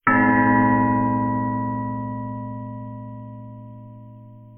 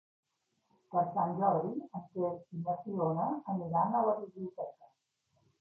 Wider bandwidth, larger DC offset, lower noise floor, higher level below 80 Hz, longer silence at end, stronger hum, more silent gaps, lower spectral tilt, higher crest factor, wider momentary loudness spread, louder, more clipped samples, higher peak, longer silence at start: first, 3.3 kHz vs 2.6 kHz; neither; second, -43 dBFS vs -79 dBFS; first, -50 dBFS vs -78 dBFS; second, 0 s vs 0.75 s; neither; neither; first, -12.5 dB/octave vs -11 dB/octave; about the same, 18 dB vs 18 dB; first, 24 LU vs 12 LU; first, -21 LUFS vs -34 LUFS; neither; first, -4 dBFS vs -16 dBFS; second, 0.05 s vs 0.9 s